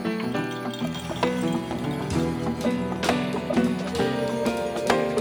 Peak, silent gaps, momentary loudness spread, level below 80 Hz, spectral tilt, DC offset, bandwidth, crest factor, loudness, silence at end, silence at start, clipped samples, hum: -6 dBFS; none; 5 LU; -48 dBFS; -5.5 dB/octave; under 0.1%; over 20 kHz; 20 dB; -26 LUFS; 0 s; 0 s; under 0.1%; none